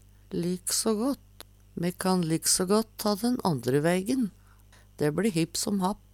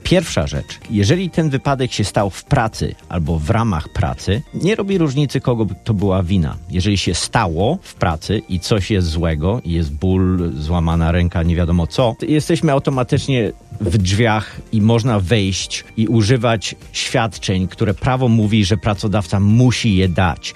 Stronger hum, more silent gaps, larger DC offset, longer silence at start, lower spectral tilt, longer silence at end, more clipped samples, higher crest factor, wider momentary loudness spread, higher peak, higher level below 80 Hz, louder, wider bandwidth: neither; neither; neither; first, 0.3 s vs 0.05 s; second, -4.5 dB/octave vs -6 dB/octave; about the same, 0.15 s vs 0.05 s; neither; about the same, 16 dB vs 14 dB; first, 9 LU vs 6 LU; second, -12 dBFS vs -2 dBFS; second, -56 dBFS vs -34 dBFS; second, -28 LUFS vs -17 LUFS; first, 18 kHz vs 13 kHz